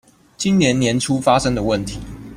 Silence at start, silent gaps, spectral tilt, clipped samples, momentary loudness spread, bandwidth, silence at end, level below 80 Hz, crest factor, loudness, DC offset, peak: 0.4 s; none; -5 dB/octave; under 0.1%; 9 LU; 14.5 kHz; 0 s; -40 dBFS; 16 dB; -18 LUFS; under 0.1%; -2 dBFS